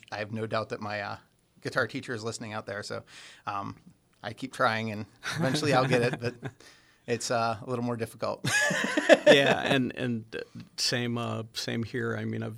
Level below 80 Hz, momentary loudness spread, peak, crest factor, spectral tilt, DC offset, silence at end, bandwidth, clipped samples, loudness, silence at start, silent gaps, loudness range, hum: -68 dBFS; 17 LU; -4 dBFS; 26 dB; -4.5 dB/octave; under 0.1%; 0 s; 16 kHz; under 0.1%; -28 LUFS; 0.1 s; none; 10 LU; none